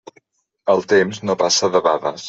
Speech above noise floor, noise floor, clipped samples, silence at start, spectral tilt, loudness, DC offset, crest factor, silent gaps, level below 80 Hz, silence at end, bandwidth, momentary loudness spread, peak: 41 dB; -58 dBFS; under 0.1%; 0.65 s; -3 dB/octave; -17 LUFS; under 0.1%; 16 dB; none; -62 dBFS; 0 s; 8 kHz; 5 LU; -2 dBFS